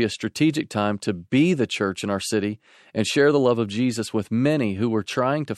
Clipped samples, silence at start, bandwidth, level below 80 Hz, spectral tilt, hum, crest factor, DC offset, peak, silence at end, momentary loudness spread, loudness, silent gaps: under 0.1%; 0 s; 13 kHz; -64 dBFS; -5.5 dB/octave; none; 16 dB; under 0.1%; -6 dBFS; 0 s; 8 LU; -23 LUFS; none